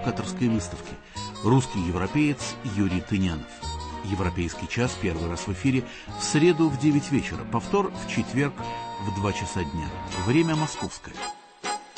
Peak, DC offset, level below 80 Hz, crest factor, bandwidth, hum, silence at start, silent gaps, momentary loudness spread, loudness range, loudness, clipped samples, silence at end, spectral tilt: -8 dBFS; under 0.1%; -44 dBFS; 18 dB; 8.8 kHz; none; 0 s; none; 12 LU; 4 LU; -27 LUFS; under 0.1%; 0 s; -5.5 dB/octave